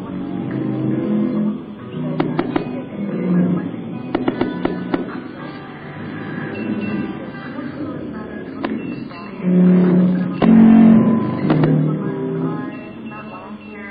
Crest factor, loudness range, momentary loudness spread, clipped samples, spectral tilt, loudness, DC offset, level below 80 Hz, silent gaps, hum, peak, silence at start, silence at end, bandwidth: 16 dB; 13 LU; 19 LU; under 0.1%; -12 dB/octave; -18 LUFS; under 0.1%; -50 dBFS; none; none; -2 dBFS; 0 s; 0 s; 4.9 kHz